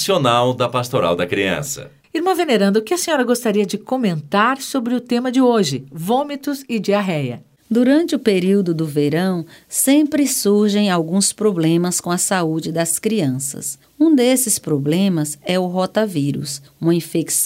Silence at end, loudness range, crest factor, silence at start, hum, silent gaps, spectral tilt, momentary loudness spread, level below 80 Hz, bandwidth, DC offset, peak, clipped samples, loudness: 0 s; 2 LU; 16 dB; 0 s; none; none; -4.5 dB/octave; 8 LU; -60 dBFS; 16.5 kHz; under 0.1%; -2 dBFS; under 0.1%; -18 LUFS